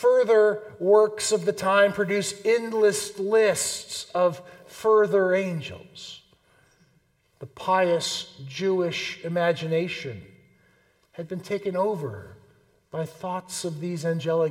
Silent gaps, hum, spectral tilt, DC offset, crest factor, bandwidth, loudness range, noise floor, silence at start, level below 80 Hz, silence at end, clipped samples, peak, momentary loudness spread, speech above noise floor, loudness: none; none; -4 dB/octave; under 0.1%; 18 dB; 16 kHz; 9 LU; -65 dBFS; 0 s; -68 dBFS; 0 s; under 0.1%; -6 dBFS; 18 LU; 41 dB; -24 LUFS